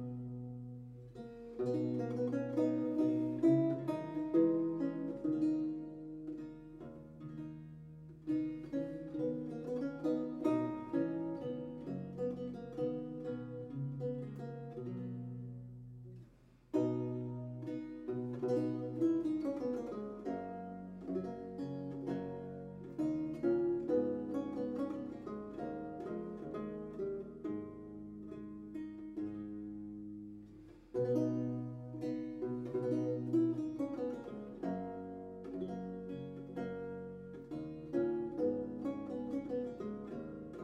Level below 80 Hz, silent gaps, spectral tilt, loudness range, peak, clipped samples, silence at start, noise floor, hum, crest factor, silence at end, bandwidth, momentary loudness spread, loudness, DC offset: -68 dBFS; none; -9.5 dB/octave; 9 LU; -18 dBFS; under 0.1%; 0 s; -63 dBFS; none; 20 dB; 0 s; 7.4 kHz; 14 LU; -39 LUFS; under 0.1%